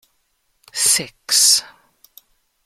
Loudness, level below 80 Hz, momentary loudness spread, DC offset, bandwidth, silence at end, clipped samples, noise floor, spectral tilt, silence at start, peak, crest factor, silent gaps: -14 LUFS; -66 dBFS; 7 LU; under 0.1%; 16.5 kHz; 1 s; under 0.1%; -67 dBFS; 1.5 dB/octave; 0.75 s; -2 dBFS; 20 dB; none